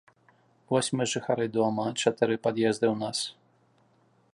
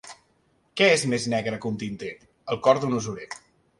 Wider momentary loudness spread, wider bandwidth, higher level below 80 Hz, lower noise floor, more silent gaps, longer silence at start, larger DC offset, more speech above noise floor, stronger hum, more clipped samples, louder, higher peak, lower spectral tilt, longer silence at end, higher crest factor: second, 5 LU vs 20 LU; about the same, 11.5 kHz vs 11.5 kHz; second, -72 dBFS vs -62 dBFS; about the same, -65 dBFS vs -66 dBFS; neither; first, 0.7 s vs 0.05 s; neither; second, 38 dB vs 42 dB; neither; neither; second, -28 LUFS vs -24 LUFS; about the same, -8 dBFS vs -6 dBFS; about the same, -4.5 dB/octave vs -4 dB/octave; first, 1.05 s vs 0.45 s; about the same, 22 dB vs 20 dB